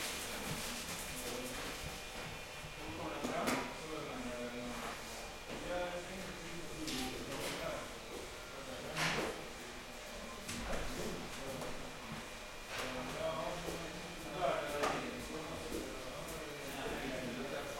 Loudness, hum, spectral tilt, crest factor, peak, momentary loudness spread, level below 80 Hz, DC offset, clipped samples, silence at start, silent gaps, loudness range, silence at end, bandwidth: -42 LUFS; none; -3 dB/octave; 20 dB; -22 dBFS; 9 LU; -56 dBFS; under 0.1%; under 0.1%; 0 s; none; 3 LU; 0 s; 16.5 kHz